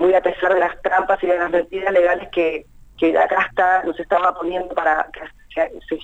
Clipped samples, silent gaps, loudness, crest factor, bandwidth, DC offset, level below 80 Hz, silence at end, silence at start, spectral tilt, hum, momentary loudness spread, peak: under 0.1%; none; -19 LUFS; 14 dB; 8 kHz; under 0.1%; -48 dBFS; 0 s; 0 s; -5.5 dB/octave; none; 7 LU; -4 dBFS